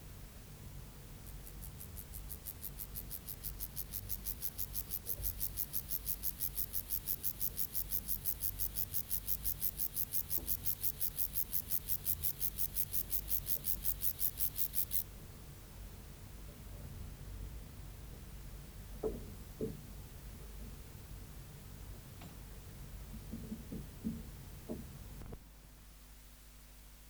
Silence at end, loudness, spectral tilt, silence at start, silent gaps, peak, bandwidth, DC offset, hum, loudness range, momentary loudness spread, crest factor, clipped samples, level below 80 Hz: 0 s; -36 LUFS; -3.5 dB/octave; 0 s; none; -16 dBFS; over 20 kHz; under 0.1%; none; 16 LU; 19 LU; 26 dB; under 0.1%; -52 dBFS